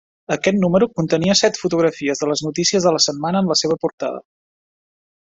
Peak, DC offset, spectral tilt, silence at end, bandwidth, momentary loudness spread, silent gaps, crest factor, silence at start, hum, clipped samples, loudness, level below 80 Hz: -2 dBFS; under 0.1%; -4 dB/octave; 1.05 s; 8 kHz; 8 LU; 3.93-3.98 s; 18 dB; 0.3 s; none; under 0.1%; -18 LUFS; -56 dBFS